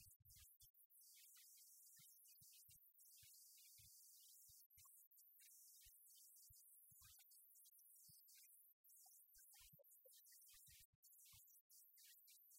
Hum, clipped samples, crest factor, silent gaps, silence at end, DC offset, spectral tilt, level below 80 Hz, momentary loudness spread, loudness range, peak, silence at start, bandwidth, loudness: none; under 0.1%; 14 dB; 0.16-0.20 s, 0.70-0.74 s, 0.86-0.90 s, 4.66-4.70 s, 5.07-5.11 s, 8.73-8.84 s, 10.85-11.03 s, 11.61-11.70 s; 0 s; under 0.1%; 0 dB/octave; -90 dBFS; 3 LU; 1 LU; -54 dBFS; 0 s; 16 kHz; -67 LUFS